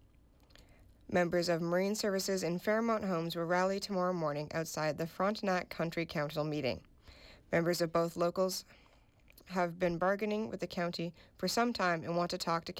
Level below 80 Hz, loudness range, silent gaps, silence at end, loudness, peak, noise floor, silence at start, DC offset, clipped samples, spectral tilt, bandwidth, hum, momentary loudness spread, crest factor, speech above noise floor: -64 dBFS; 3 LU; none; 0 s; -34 LUFS; -20 dBFS; -64 dBFS; 0.6 s; under 0.1%; under 0.1%; -5 dB/octave; 17 kHz; none; 6 LU; 16 dB; 30 dB